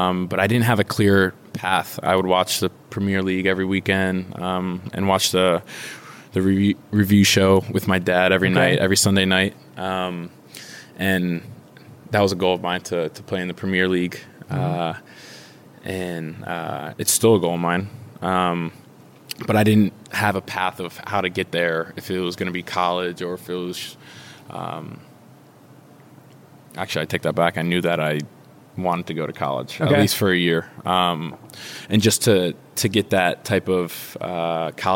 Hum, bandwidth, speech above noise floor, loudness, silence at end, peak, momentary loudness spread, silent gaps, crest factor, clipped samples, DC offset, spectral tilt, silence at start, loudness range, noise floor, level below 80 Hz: none; 17 kHz; 27 dB; -21 LUFS; 0 s; -2 dBFS; 16 LU; none; 18 dB; under 0.1%; under 0.1%; -4.5 dB/octave; 0 s; 8 LU; -48 dBFS; -62 dBFS